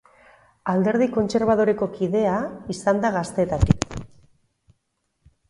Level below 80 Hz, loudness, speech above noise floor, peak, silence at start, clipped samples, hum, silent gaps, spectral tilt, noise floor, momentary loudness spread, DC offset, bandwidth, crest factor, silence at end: -38 dBFS; -22 LUFS; 52 dB; 0 dBFS; 0.65 s; under 0.1%; none; none; -6.5 dB/octave; -73 dBFS; 9 LU; under 0.1%; 11.5 kHz; 24 dB; 1.45 s